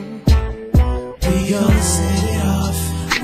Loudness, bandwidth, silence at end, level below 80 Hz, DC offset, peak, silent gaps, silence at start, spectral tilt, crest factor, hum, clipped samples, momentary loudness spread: -17 LUFS; 15.5 kHz; 0 s; -20 dBFS; under 0.1%; -4 dBFS; none; 0 s; -5 dB/octave; 14 dB; none; under 0.1%; 5 LU